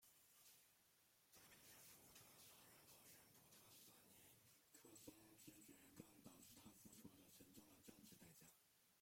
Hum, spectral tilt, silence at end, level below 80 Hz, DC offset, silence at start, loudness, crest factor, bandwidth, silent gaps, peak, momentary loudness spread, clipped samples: none; -3 dB/octave; 0 s; under -90 dBFS; under 0.1%; 0 s; -66 LUFS; 24 dB; 16.5 kHz; none; -44 dBFS; 4 LU; under 0.1%